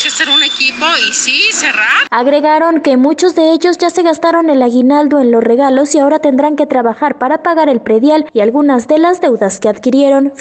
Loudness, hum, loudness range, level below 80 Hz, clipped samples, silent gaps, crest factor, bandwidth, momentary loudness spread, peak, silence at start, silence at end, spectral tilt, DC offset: -9 LUFS; none; 2 LU; -58 dBFS; under 0.1%; none; 10 dB; 9.2 kHz; 3 LU; 0 dBFS; 0 s; 0 s; -2.5 dB/octave; under 0.1%